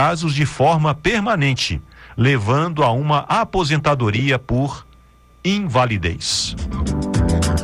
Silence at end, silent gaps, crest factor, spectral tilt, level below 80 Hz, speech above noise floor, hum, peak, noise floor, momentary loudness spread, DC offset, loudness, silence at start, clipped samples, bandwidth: 0 s; none; 12 dB; -5.5 dB/octave; -32 dBFS; 31 dB; none; -6 dBFS; -49 dBFS; 7 LU; under 0.1%; -18 LUFS; 0 s; under 0.1%; 12.5 kHz